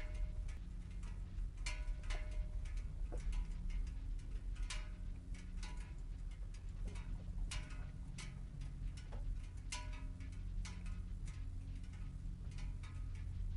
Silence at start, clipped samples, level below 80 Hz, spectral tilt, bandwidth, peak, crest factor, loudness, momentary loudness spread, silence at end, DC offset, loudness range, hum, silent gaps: 0 s; under 0.1%; -44 dBFS; -4.5 dB/octave; 11 kHz; -28 dBFS; 16 dB; -49 LUFS; 4 LU; 0 s; under 0.1%; 2 LU; none; none